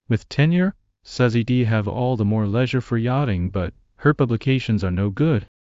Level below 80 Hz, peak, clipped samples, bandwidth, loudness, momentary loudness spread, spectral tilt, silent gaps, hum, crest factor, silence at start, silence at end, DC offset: -40 dBFS; -4 dBFS; under 0.1%; 7.8 kHz; -21 LUFS; 6 LU; -8 dB/octave; none; none; 16 dB; 0.1 s; 0.3 s; under 0.1%